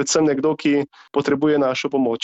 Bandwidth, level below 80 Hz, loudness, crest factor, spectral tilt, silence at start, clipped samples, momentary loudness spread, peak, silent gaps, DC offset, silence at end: 8.4 kHz; -60 dBFS; -20 LUFS; 14 dB; -4.5 dB/octave; 0 s; under 0.1%; 5 LU; -6 dBFS; none; under 0.1%; 0.05 s